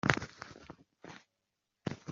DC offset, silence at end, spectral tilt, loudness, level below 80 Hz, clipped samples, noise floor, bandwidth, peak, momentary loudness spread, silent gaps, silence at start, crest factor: under 0.1%; 0 s; -4 dB/octave; -40 LUFS; -62 dBFS; under 0.1%; -86 dBFS; 7.6 kHz; -4 dBFS; 19 LU; none; 0.05 s; 36 dB